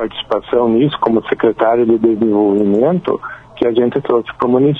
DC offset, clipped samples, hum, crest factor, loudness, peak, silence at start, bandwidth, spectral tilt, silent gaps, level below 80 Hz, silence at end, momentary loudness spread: under 0.1%; under 0.1%; none; 14 dB; -14 LUFS; 0 dBFS; 0 s; 4.2 kHz; -9 dB/octave; none; -48 dBFS; 0 s; 6 LU